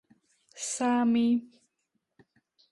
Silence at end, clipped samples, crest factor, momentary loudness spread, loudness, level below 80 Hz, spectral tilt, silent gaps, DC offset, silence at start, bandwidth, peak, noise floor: 1.25 s; under 0.1%; 14 dB; 10 LU; -28 LUFS; -78 dBFS; -3.5 dB/octave; none; under 0.1%; 0.55 s; 11.5 kHz; -18 dBFS; -80 dBFS